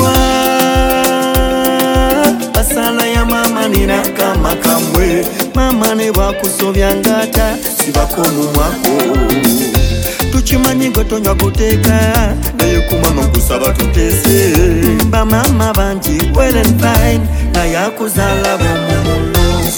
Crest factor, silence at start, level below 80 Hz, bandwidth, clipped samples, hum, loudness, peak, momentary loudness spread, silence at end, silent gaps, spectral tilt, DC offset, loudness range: 10 dB; 0 s; -18 dBFS; 17.5 kHz; under 0.1%; none; -12 LUFS; 0 dBFS; 4 LU; 0 s; none; -4.5 dB/octave; under 0.1%; 1 LU